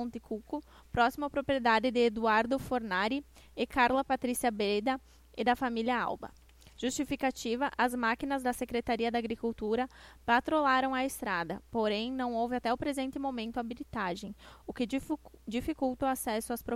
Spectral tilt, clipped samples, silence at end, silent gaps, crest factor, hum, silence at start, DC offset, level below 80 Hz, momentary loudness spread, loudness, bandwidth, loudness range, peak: -4 dB/octave; under 0.1%; 0 s; none; 18 dB; none; 0 s; under 0.1%; -56 dBFS; 11 LU; -32 LUFS; 16 kHz; 6 LU; -14 dBFS